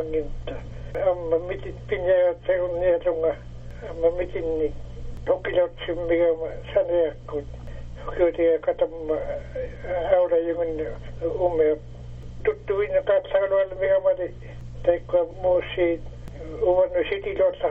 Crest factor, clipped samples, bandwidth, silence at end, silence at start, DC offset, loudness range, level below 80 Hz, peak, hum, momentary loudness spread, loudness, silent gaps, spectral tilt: 18 dB; under 0.1%; 4.6 kHz; 0 s; 0 s; under 0.1%; 2 LU; -40 dBFS; -6 dBFS; 60 Hz at -45 dBFS; 15 LU; -24 LUFS; none; -5 dB/octave